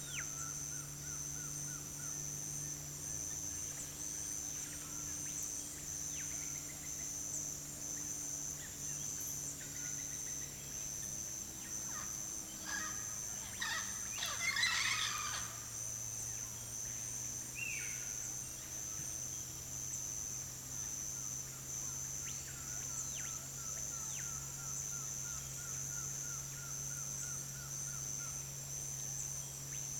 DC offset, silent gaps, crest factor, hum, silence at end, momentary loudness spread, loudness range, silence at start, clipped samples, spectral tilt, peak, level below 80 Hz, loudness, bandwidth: under 0.1%; none; 22 dB; none; 0 s; 4 LU; 4 LU; 0 s; under 0.1%; -1 dB/octave; -22 dBFS; -62 dBFS; -40 LUFS; 16 kHz